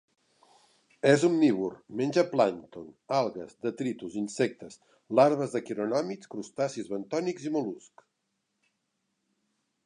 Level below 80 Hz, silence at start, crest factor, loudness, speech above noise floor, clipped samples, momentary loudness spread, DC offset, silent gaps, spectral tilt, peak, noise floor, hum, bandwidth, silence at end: -76 dBFS; 1.05 s; 22 dB; -29 LUFS; 52 dB; under 0.1%; 16 LU; under 0.1%; none; -6 dB/octave; -8 dBFS; -80 dBFS; none; 11 kHz; 2.05 s